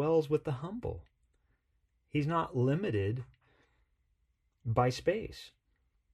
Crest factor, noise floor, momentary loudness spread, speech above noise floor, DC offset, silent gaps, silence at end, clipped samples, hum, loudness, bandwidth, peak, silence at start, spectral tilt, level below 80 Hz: 20 dB; -77 dBFS; 17 LU; 44 dB; under 0.1%; none; 0.65 s; under 0.1%; none; -33 LUFS; 13 kHz; -14 dBFS; 0 s; -7.5 dB/octave; -58 dBFS